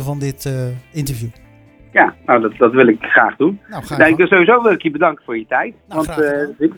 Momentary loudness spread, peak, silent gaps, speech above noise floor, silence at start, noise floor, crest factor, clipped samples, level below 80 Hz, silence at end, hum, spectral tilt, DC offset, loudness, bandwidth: 13 LU; 0 dBFS; none; 30 dB; 0 s; -45 dBFS; 16 dB; under 0.1%; -46 dBFS; 0.05 s; none; -6.5 dB/octave; under 0.1%; -14 LUFS; 19 kHz